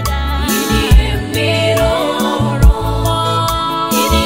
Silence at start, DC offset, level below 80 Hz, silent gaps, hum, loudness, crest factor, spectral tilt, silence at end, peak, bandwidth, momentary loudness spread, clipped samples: 0 s; under 0.1%; -16 dBFS; none; none; -14 LUFS; 12 dB; -5 dB/octave; 0 s; 0 dBFS; 16.5 kHz; 4 LU; under 0.1%